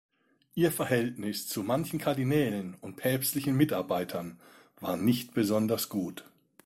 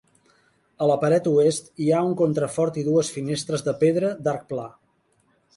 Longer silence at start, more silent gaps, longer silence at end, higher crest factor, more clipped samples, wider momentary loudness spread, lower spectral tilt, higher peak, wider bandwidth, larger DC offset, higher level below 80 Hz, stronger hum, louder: second, 0.55 s vs 0.8 s; neither; second, 0.45 s vs 0.9 s; about the same, 18 dB vs 16 dB; neither; first, 11 LU vs 8 LU; about the same, -5.5 dB/octave vs -6 dB/octave; second, -12 dBFS vs -8 dBFS; first, 16.5 kHz vs 11.5 kHz; neither; about the same, -64 dBFS vs -64 dBFS; neither; second, -30 LUFS vs -23 LUFS